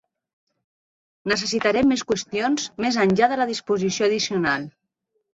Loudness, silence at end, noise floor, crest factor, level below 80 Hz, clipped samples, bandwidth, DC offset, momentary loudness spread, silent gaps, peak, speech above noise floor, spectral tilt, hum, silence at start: -22 LUFS; 0.7 s; -75 dBFS; 20 dB; -58 dBFS; under 0.1%; 8 kHz; under 0.1%; 6 LU; none; -4 dBFS; 54 dB; -4 dB/octave; none; 1.25 s